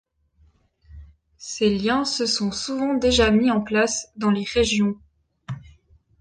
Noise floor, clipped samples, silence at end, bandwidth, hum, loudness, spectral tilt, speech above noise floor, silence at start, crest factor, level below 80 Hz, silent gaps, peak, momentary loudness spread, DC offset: -60 dBFS; under 0.1%; 0.6 s; 10 kHz; none; -21 LUFS; -4 dB/octave; 39 dB; 0.9 s; 18 dB; -42 dBFS; none; -6 dBFS; 19 LU; under 0.1%